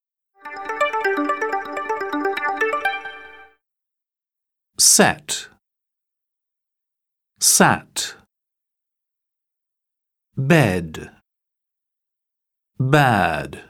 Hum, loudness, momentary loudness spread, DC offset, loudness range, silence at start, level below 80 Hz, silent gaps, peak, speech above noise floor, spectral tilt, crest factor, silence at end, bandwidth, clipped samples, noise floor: none; -18 LUFS; 20 LU; under 0.1%; 5 LU; 0.45 s; -56 dBFS; none; -2 dBFS; 69 dB; -3 dB/octave; 22 dB; 0.05 s; 19 kHz; under 0.1%; -87 dBFS